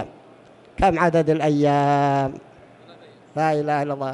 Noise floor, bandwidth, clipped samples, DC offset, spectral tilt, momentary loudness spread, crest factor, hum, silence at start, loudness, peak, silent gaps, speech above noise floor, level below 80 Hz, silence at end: -48 dBFS; 11.5 kHz; under 0.1%; under 0.1%; -7 dB/octave; 15 LU; 16 dB; none; 0 s; -20 LUFS; -6 dBFS; none; 29 dB; -44 dBFS; 0 s